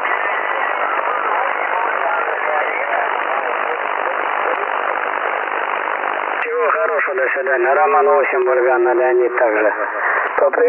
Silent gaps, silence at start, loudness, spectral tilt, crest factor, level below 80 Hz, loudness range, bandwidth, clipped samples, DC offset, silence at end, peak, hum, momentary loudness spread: none; 0 s; -17 LUFS; -6 dB/octave; 14 dB; -86 dBFS; 4 LU; 3.4 kHz; under 0.1%; under 0.1%; 0 s; -2 dBFS; none; 5 LU